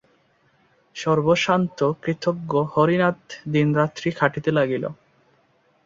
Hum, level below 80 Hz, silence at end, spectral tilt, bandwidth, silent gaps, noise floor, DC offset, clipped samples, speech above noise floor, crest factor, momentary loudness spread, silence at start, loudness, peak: none; -60 dBFS; 0.95 s; -6.5 dB/octave; 7.6 kHz; none; -62 dBFS; under 0.1%; under 0.1%; 41 dB; 20 dB; 9 LU; 0.95 s; -22 LUFS; -2 dBFS